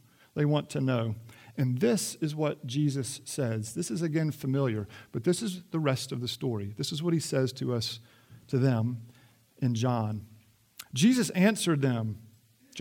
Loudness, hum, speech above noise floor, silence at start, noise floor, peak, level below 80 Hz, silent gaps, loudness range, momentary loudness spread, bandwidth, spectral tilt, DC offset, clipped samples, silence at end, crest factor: -30 LUFS; none; 31 dB; 0.35 s; -59 dBFS; -12 dBFS; -70 dBFS; none; 3 LU; 12 LU; 17 kHz; -5.5 dB/octave; under 0.1%; under 0.1%; 0 s; 18 dB